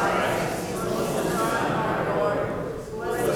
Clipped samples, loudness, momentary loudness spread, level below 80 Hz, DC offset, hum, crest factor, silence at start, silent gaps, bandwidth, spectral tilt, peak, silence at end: under 0.1%; -26 LUFS; 6 LU; -48 dBFS; under 0.1%; none; 14 dB; 0 s; none; over 20 kHz; -5 dB/octave; -12 dBFS; 0 s